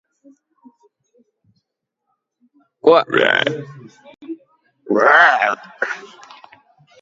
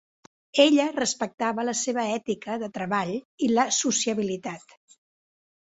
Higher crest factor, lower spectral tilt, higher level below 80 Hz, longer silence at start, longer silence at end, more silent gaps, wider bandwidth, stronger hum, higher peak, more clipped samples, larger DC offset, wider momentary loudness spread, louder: about the same, 20 dB vs 22 dB; first, -4.5 dB/octave vs -3 dB/octave; about the same, -70 dBFS vs -70 dBFS; first, 2.85 s vs 0.55 s; about the same, 1 s vs 1.1 s; second, none vs 1.34-1.38 s, 3.25-3.38 s; about the same, 7.6 kHz vs 8.2 kHz; neither; first, 0 dBFS vs -4 dBFS; neither; neither; first, 24 LU vs 12 LU; first, -15 LUFS vs -25 LUFS